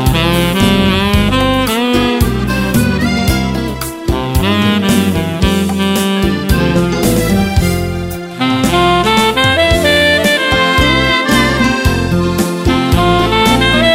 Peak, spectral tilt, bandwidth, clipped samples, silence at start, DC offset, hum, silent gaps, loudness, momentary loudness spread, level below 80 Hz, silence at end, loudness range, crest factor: 0 dBFS; -5 dB/octave; 16.5 kHz; under 0.1%; 0 s; under 0.1%; none; none; -12 LUFS; 6 LU; -22 dBFS; 0 s; 4 LU; 12 dB